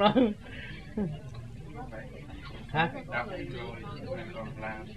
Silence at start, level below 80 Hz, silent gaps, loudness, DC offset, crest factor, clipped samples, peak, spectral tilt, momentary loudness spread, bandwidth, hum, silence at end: 0 s; -50 dBFS; none; -35 LUFS; 0.3%; 24 dB; under 0.1%; -8 dBFS; -7 dB/octave; 14 LU; 12 kHz; none; 0 s